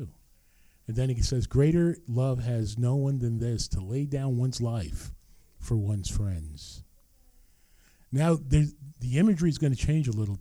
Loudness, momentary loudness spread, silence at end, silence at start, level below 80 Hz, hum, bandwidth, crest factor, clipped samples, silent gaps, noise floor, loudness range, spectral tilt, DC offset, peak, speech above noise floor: -28 LUFS; 14 LU; 0 s; 0 s; -40 dBFS; none; 13 kHz; 18 dB; under 0.1%; none; -60 dBFS; 6 LU; -7 dB/octave; under 0.1%; -10 dBFS; 33 dB